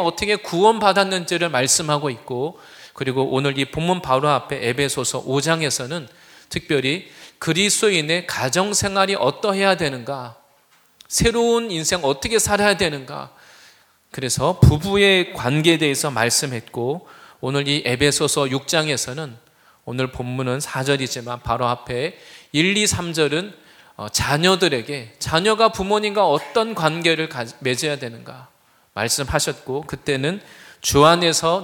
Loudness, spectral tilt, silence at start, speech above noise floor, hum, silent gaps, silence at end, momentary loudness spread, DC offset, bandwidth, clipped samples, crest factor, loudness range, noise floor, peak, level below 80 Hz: -19 LUFS; -3.5 dB/octave; 0 s; 37 dB; none; none; 0 s; 13 LU; under 0.1%; 19 kHz; under 0.1%; 20 dB; 4 LU; -57 dBFS; 0 dBFS; -42 dBFS